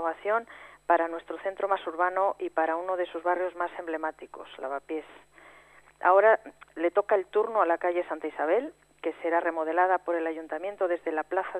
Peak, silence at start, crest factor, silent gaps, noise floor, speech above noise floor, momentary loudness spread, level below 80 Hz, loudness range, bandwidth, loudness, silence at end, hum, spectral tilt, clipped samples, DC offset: -8 dBFS; 0 s; 20 dB; none; -56 dBFS; 28 dB; 11 LU; -72 dBFS; 6 LU; 10.5 kHz; -28 LUFS; 0 s; 50 Hz at -70 dBFS; -5 dB/octave; under 0.1%; under 0.1%